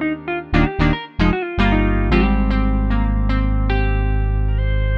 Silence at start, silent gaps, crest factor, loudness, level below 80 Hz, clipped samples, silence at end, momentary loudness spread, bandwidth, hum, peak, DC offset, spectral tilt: 0 s; none; 16 dB; -19 LUFS; -20 dBFS; under 0.1%; 0 s; 4 LU; 5.4 kHz; 50 Hz at -35 dBFS; -2 dBFS; under 0.1%; -8.5 dB/octave